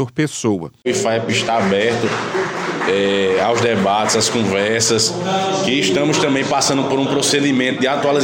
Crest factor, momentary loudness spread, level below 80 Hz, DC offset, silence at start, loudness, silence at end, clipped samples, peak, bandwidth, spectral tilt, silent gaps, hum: 12 dB; 5 LU; -56 dBFS; under 0.1%; 0 s; -16 LUFS; 0 s; under 0.1%; -4 dBFS; 17 kHz; -3.5 dB/octave; none; none